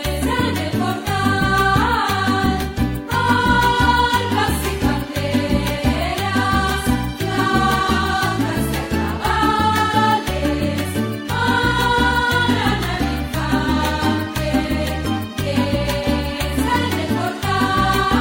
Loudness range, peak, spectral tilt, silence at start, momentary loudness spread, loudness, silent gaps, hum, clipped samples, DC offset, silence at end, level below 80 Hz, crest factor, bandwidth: 3 LU; -2 dBFS; -5 dB/octave; 0 s; 6 LU; -18 LUFS; none; none; under 0.1%; under 0.1%; 0 s; -30 dBFS; 16 dB; 16.5 kHz